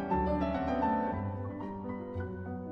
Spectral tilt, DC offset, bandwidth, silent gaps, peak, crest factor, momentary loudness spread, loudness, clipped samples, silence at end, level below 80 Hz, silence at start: -9.5 dB/octave; under 0.1%; 6.6 kHz; none; -20 dBFS; 14 dB; 9 LU; -34 LUFS; under 0.1%; 0 s; -46 dBFS; 0 s